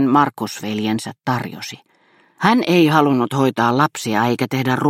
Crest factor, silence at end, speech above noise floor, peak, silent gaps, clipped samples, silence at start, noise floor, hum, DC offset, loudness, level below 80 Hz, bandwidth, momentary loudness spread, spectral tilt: 18 dB; 0 s; 38 dB; 0 dBFS; none; under 0.1%; 0 s; -56 dBFS; none; under 0.1%; -18 LUFS; -62 dBFS; 16.5 kHz; 10 LU; -5.5 dB/octave